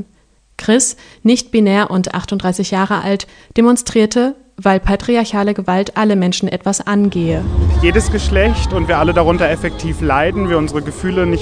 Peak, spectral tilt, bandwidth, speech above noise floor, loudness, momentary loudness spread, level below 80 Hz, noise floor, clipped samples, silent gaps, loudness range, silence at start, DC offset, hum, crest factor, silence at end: 0 dBFS; -5 dB/octave; 10 kHz; 38 dB; -15 LUFS; 6 LU; -24 dBFS; -52 dBFS; under 0.1%; none; 1 LU; 0 s; under 0.1%; none; 14 dB; 0 s